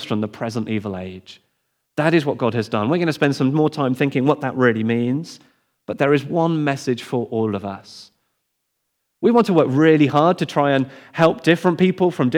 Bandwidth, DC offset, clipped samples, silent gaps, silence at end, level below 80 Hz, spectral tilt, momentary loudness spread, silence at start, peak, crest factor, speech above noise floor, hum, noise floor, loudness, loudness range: 15 kHz; under 0.1%; under 0.1%; none; 0 s; -68 dBFS; -7 dB/octave; 12 LU; 0 s; -2 dBFS; 16 dB; 55 dB; none; -74 dBFS; -19 LUFS; 6 LU